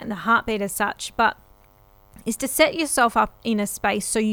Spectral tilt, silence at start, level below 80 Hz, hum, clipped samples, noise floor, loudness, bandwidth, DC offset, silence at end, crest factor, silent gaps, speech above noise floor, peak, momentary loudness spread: -3 dB/octave; 0 s; -50 dBFS; none; under 0.1%; -54 dBFS; -22 LUFS; over 20 kHz; under 0.1%; 0 s; 20 dB; none; 32 dB; -2 dBFS; 7 LU